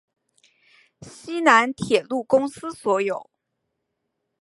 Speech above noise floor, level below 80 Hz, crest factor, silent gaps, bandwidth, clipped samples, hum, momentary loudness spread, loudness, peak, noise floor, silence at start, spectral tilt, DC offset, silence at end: 57 dB; -64 dBFS; 24 dB; none; 11.5 kHz; under 0.1%; none; 15 LU; -21 LUFS; -2 dBFS; -78 dBFS; 1 s; -4 dB/octave; under 0.1%; 1.2 s